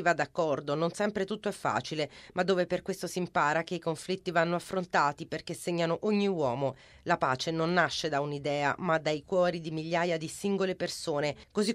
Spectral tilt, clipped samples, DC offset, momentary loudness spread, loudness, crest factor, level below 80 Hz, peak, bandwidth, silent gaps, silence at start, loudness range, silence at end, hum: -5 dB/octave; under 0.1%; under 0.1%; 6 LU; -31 LUFS; 20 dB; -64 dBFS; -10 dBFS; 14.5 kHz; none; 0 s; 2 LU; 0 s; none